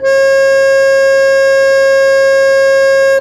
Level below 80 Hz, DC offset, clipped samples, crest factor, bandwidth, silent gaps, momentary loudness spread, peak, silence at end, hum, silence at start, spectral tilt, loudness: -48 dBFS; under 0.1%; under 0.1%; 6 dB; 12.5 kHz; none; 0 LU; -2 dBFS; 0 s; none; 0 s; -1.5 dB/octave; -8 LUFS